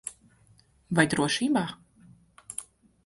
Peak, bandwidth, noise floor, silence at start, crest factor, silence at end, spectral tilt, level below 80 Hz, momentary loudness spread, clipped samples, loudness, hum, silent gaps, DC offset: -6 dBFS; 12 kHz; -61 dBFS; 0.05 s; 24 dB; 0.45 s; -4 dB/octave; -62 dBFS; 16 LU; under 0.1%; -27 LUFS; none; none; under 0.1%